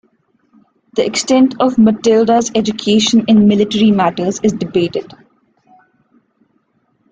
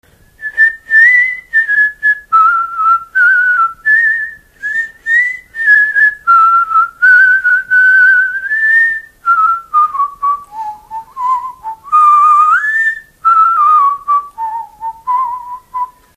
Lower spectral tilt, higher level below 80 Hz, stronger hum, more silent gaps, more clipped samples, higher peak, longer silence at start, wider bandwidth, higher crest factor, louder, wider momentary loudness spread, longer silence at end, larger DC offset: first, -5 dB/octave vs -0.5 dB/octave; about the same, -52 dBFS vs -52 dBFS; neither; neither; neither; about the same, -2 dBFS vs 0 dBFS; first, 0.95 s vs 0.4 s; second, 9.2 kHz vs 15 kHz; about the same, 12 dB vs 12 dB; second, -13 LUFS vs -9 LUFS; second, 7 LU vs 16 LU; first, 2.1 s vs 0.3 s; neither